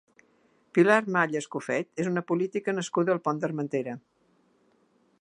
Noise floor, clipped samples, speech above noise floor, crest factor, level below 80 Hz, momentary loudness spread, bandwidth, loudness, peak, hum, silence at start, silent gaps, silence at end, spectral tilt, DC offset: -67 dBFS; under 0.1%; 40 dB; 24 dB; -78 dBFS; 10 LU; 11 kHz; -27 LUFS; -6 dBFS; none; 0.75 s; none; 1.2 s; -6 dB/octave; under 0.1%